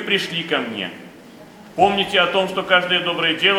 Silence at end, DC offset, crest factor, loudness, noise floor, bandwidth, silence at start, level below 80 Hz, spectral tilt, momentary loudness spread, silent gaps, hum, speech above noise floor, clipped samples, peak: 0 s; under 0.1%; 20 dB; -18 LUFS; -42 dBFS; 16.5 kHz; 0 s; -58 dBFS; -4 dB/octave; 13 LU; none; none; 23 dB; under 0.1%; 0 dBFS